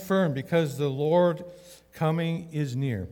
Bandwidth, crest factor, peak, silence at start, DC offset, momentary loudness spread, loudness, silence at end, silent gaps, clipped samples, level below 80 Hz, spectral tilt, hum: 18 kHz; 16 dB; -10 dBFS; 0 s; under 0.1%; 8 LU; -27 LUFS; 0 s; none; under 0.1%; -64 dBFS; -7.5 dB/octave; none